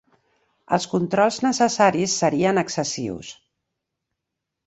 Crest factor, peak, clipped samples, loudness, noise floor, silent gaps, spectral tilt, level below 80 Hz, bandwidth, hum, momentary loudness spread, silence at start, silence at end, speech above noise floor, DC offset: 20 dB; -4 dBFS; under 0.1%; -21 LUFS; -82 dBFS; none; -4 dB/octave; -60 dBFS; 8.2 kHz; none; 11 LU; 0.7 s; 1.35 s; 62 dB; under 0.1%